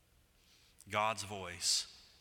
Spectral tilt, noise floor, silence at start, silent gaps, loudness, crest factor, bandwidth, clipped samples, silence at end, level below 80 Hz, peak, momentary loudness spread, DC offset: -1 dB/octave; -69 dBFS; 0.85 s; none; -36 LUFS; 22 dB; 18.5 kHz; under 0.1%; 0.15 s; -72 dBFS; -18 dBFS; 10 LU; under 0.1%